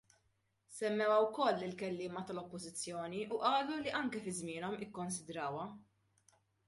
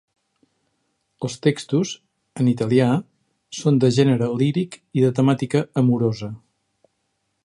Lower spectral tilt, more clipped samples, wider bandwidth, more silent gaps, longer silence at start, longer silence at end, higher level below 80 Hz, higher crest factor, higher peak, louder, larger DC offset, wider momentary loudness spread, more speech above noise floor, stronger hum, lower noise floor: second, -4 dB/octave vs -7 dB/octave; neither; about the same, 11.5 kHz vs 11.5 kHz; neither; second, 0.7 s vs 1.2 s; second, 0.85 s vs 1.05 s; second, -78 dBFS vs -62 dBFS; about the same, 20 dB vs 18 dB; second, -20 dBFS vs -4 dBFS; second, -38 LUFS vs -20 LUFS; neither; about the same, 13 LU vs 14 LU; second, 41 dB vs 53 dB; neither; first, -79 dBFS vs -73 dBFS